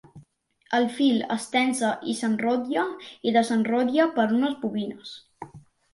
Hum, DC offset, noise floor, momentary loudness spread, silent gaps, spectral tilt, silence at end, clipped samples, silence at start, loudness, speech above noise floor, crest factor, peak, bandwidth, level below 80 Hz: none; under 0.1%; -61 dBFS; 18 LU; none; -4.5 dB/octave; 0.35 s; under 0.1%; 0.15 s; -25 LUFS; 36 dB; 18 dB; -8 dBFS; 11.5 kHz; -70 dBFS